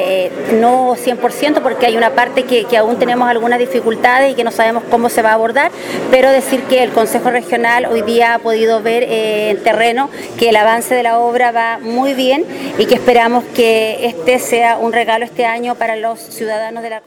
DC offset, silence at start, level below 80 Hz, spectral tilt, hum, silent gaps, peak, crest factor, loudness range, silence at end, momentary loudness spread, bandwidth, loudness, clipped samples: under 0.1%; 0 s; -54 dBFS; -3.5 dB/octave; none; none; 0 dBFS; 12 dB; 1 LU; 0.05 s; 6 LU; 18.5 kHz; -13 LUFS; under 0.1%